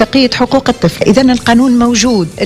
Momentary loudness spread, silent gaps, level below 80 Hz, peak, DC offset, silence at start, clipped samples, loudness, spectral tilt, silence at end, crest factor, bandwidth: 3 LU; none; -34 dBFS; 0 dBFS; under 0.1%; 0 s; 0.6%; -9 LUFS; -4.5 dB/octave; 0 s; 10 dB; 14.5 kHz